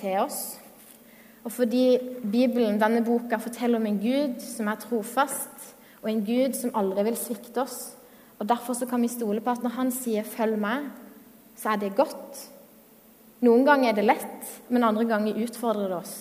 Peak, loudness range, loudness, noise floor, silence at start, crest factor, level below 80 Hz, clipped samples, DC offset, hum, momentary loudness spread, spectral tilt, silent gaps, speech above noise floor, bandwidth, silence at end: -4 dBFS; 5 LU; -26 LUFS; -54 dBFS; 0 s; 22 dB; -74 dBFS; under 0.1%; under 0.1%; none; 15 LU; -4.5 dB/octave; none; 28 dB; 16 kHz; 0 s